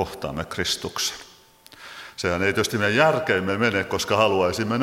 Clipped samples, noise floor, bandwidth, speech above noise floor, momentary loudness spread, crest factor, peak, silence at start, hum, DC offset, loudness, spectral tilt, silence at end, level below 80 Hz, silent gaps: under 0.1%; -50 dBFS; 16.5 kHz; 28 dB; 12 LU; 22 dB; -2 dBFS; 0 s; none; under 0.1%; -22 LUFS; -4 dB/octave; 0 s; -52 dBFS; none